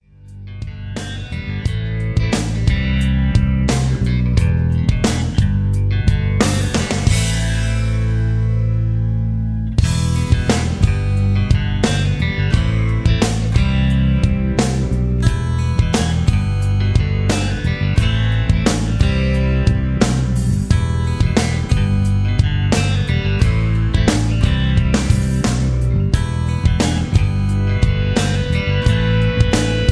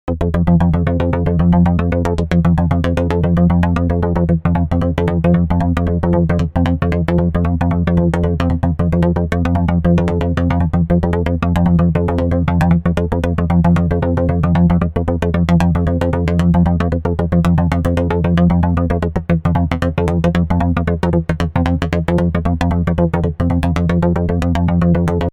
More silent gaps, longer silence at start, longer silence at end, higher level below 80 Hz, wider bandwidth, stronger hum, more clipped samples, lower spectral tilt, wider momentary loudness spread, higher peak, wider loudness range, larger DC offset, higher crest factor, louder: neither; first, 0.25 s vs 0.05 s; about the same, 0 s vs 0.05 s; about the same, -22 dBFS vs -24 dBFS; first, 11 kHz vs 7.4 kHz; neither; neither; second, -6 dB/octave vs -9 dB/octave; about the same, 3 LU vs 4 LU; about the same, 0 dBFS vs 0 dBFS; about the same, 1 LU vs 2 LU; neither; about the same, 16 dB vs 14 dB; about the same, -17 LUFS vs -15 LUFS